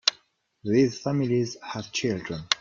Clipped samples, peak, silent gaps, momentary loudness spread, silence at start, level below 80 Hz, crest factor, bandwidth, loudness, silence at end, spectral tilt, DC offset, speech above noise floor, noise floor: under 0.1%; 0 dBFS; none; 9 LU; 0.05 s; -60 dBFS; 26 dB; 7.6 kHz; -26 LUFS; 0.05 s; -4.5 dB/octave; under 0.1%; 37 dB; -63 dBFS